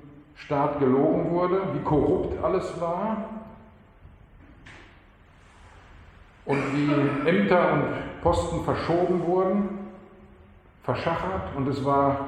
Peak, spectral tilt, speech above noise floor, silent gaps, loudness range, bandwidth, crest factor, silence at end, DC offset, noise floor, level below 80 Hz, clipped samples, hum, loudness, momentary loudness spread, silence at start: -8 dBFS; -7.5 dB/octave; 29 dB; none; 11 LU; 10 kHz; 18 dB; 0 s; under 0.1%; -53 dBFS; -48 dBFS; under 0.1%; none; -25 LUFS; 11 LU; 0 s